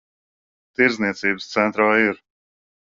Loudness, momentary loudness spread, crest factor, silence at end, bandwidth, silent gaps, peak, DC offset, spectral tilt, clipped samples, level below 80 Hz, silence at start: -19 LUFS; 9 LU; 20 dB; 0.75 s; 7.6 kHz; none; -2 dBFS; under 0.1%; -3 dB/octave; under 0.1%; -64 dBFS; 0.8 s